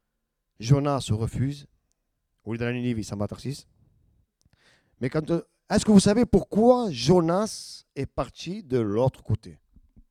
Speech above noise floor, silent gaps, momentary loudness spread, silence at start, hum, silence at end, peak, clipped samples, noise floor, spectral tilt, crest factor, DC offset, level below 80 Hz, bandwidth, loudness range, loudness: 55 dB; none; 16 LU; 0.6 s; none; 0.6 s; -4 dBFS; under 0.1%; -79 dBFS; -6.5 dB/octave; 20 dB; under 0.1%; -48 dBFS; 13.5 kHz; 11 LU; -25 LUFS